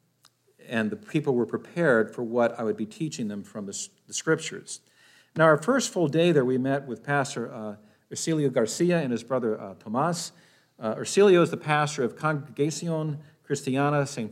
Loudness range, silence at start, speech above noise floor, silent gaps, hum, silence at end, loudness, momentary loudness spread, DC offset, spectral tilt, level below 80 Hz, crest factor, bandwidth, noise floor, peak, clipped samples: 3 LU; 0.65 s; 38 dB; none; none; 0 s; -26 LUFS; 14 LU; under 0.1%; -5 dB/octave; -80 dBFS; 18 dB; 15 kHz; -64 dBFS; -8 dBFS; under 0.1%